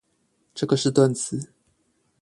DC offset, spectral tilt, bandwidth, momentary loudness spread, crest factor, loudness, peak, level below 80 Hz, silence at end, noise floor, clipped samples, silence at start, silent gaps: under 0.1%; -5.5 dB/octave; 11.5 kHz; 20 LU; 20 dB; -23 LUFS; -6 dBFS; -62 dBFS; 0.75 s; -69 dBFS; under 0.1%; 0.55 s; none